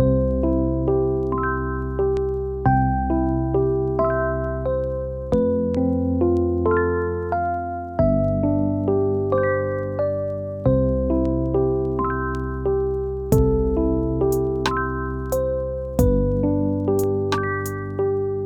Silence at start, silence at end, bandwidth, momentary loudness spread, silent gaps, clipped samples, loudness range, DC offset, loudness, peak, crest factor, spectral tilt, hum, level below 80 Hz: 0 s; 0 s; 18.5 kHz; 5 LU; none; under 0.1%; 1 LU; under 0.1%; -22 LUFS; -4 dBFS; 16 dB; -8 dB/octave; none; -30 dBFS